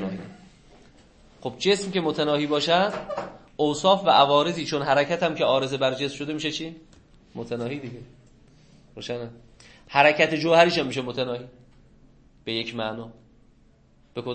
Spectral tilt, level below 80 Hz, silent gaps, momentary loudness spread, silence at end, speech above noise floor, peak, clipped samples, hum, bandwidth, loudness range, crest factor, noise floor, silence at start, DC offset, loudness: -4.5 dB/octave; -58 dBFS; none; 20 LU; 0 s; 34 dB; -2 dBFS; under 0.1%; none; 8.8 kHz; 12 LU; 24 dB; -57 dBFS; 0 s; under 0.1%; -23 LUFS